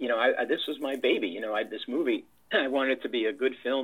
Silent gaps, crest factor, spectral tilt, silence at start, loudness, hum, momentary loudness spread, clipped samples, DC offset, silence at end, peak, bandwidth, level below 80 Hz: none; 16 dB; -4.5 dB/octave; 0 s; -29 LUFS; none; 6 LU; under 0.1%; under 0.1%; 0 s; -12 dBFS; 16 kHz; -78 dBFS